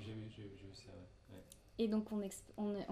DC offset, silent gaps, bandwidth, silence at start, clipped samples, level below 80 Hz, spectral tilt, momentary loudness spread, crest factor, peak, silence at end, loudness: under 0.1%; none; 15.5 kHz; 0 s; under 0.1%; -68 dBFS; -6 dB/octave; 20 LU; 18 dB; -26 dBFS; 0 s; -43 LUFS